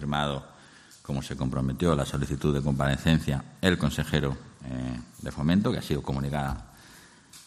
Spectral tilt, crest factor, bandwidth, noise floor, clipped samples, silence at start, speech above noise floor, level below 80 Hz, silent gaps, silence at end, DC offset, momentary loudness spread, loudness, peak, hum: -6 dB/octave; 22 dB; 13.5 kHz; -53 dBFS; under 0.1%; 0 s; 25 dB; -42 dBFS; none; 0.05 s; under 0.1%; 13 LU; -28 LUFS; -6 dBFS; none